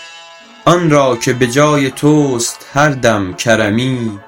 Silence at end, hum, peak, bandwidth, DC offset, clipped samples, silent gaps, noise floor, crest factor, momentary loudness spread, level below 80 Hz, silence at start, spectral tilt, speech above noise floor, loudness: 0.1 s; none; 0 dBFS; 17 kHz; under 0.1%; 0.4%; none; -37 dBFS; 12 dB; 6 LU; -44 dBFS; 0 s; -5 dB/octave; 25 dB; -12 LUFS